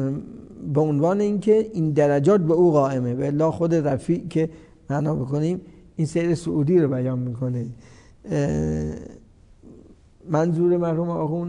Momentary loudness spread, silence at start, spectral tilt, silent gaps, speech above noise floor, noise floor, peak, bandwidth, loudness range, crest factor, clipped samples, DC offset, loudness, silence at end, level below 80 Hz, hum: 11 LU; 0 s; -8.5 dB/octave; none; 28 dB; -49 dBFS; -8 dBFS; 10.5 kHz; 7 LU; 14 dB; under 0.1%; under 0.1%; -22 LUFS; 0 s; -50 dBFS; none